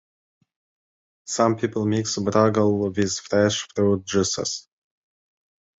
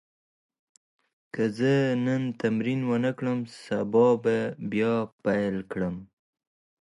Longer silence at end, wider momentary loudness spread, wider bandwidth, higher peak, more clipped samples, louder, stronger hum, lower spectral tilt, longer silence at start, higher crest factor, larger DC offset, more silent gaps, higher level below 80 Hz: first, 1.2 s vs 0.85 s; about the same, 8 LU vs 10 LU; second, 8.2 kHz vs 11.5 kHz; first, -6 dBFS vs -10 dBFS; neither; first, -22 LUFS vs -27 LUFS; neither; second, -4.5 dB/octave vs -7.5 dB/octave; about the same, 1.25 s vs 1.35 s; about the same, 18 dB vs 16 dB; neither; second, none vs 5.12-5.19 s; first, -52 dBFS vs -64 dBFS